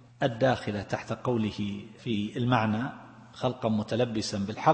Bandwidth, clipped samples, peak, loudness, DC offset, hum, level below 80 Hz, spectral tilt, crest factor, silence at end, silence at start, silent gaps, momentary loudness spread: 8.8 kHz; under 0.1%; -8 dBFS; -30 LUFS; under 0.1%; none; -60 dBFS; -6 dB/octave; 22 dB; 0 s; 0.2 s; none; 9 LU